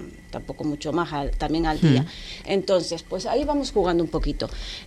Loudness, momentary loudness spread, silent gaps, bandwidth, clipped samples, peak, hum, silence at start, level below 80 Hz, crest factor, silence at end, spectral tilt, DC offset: -24 LUFS; 11 LU; none; 13 kHz; under 0.1%; -6 dBFS; none; 0 s; -36 dBFS; 18 dB; 0 s; -6 dB/octave; under 0.1%